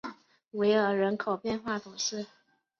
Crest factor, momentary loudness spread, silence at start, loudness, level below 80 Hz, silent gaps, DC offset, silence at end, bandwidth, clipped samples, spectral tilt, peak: 18 dB; 16 LU; 0.05 s; -30 LUFS; -68 dBFS; none; under 0.1%; 0.55 s; 7.2 kHz; under 0.1%; -4 dB/octave; -14 dBFS